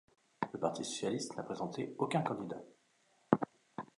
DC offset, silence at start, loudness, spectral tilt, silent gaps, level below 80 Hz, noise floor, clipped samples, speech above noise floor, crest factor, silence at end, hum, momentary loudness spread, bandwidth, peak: under 0.1%; 0.4 s; -38 LUFS; -5 dB/octave; none; -78 dBFS; -73 dBFS; under 0.1%; 35 dB; 28 dB; 0.15 s; none; 10 LU; 11.5 kHz; -10 dBFS